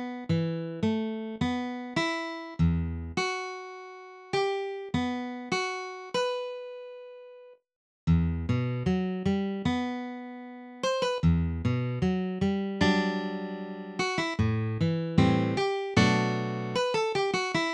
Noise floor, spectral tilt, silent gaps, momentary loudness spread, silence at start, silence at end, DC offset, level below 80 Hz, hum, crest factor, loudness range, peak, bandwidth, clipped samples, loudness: -51 dBFS; -6 dB/octave; 7.76-8.07 s; 13 LU; 0 s; 0 s; under 0.1%; -46 dBFS; none; 20 dB; 5 LU; -8 dBFS; 10.5 kHz; under 0.1%; -29 LUFS